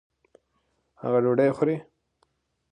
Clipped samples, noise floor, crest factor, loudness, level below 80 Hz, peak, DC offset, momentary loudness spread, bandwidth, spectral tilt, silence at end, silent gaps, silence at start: under 0.1%; -73 dBFS; 18 dB; -25 LUFS; -70 dBFS; -10 dBFS; under 0.1%; 12 LU; 9.4 kHz; -9 dB/octave; 0.9 s; none; 1.05 s